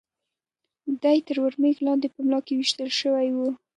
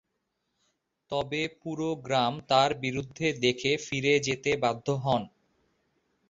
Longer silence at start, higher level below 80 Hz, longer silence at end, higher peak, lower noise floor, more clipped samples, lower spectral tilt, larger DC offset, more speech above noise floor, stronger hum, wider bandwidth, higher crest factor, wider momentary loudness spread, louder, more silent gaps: second, 0.85 s vs 1.1 s; second, -80 dBFS vs -62 dBFS; second, 0.2 s vs 1 s; about the same, -8 dBFS vs -8 dBFS; first, -86 dBFS vs -80 dBFS; neither; second, -2.5 dB/octave vs -4.5 dB/octave; neither; first, 62 dB vs 52 dB; neither; first, 10.5 kHz vs 7.8 kHz; second, 16 dB vs 22 dB; second, 5 LU vs 9 LU; first, -24 LUFS vs -28 LUFS; neither